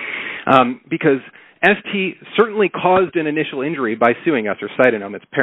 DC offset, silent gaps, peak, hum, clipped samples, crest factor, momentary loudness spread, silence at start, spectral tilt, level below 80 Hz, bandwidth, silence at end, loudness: under 0.1%; none; 0 dBFS; none; under 0.1%; 18 dB; 8 LU; 0 s; -3.5 dB/octave; -60 dBFS; 4.3 kHz; 0 s; -17 LUFS